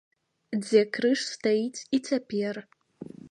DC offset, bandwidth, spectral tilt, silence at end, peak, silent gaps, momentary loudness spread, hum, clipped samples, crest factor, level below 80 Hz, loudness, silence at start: under 0.1%; 11 kHz; -4.5 dB/octave; 0.05 s; -8 dBFS; none; 19 LU; none; under 0.1%; 20 dB; -76 dBFS; -27 LUFS; 0.5 s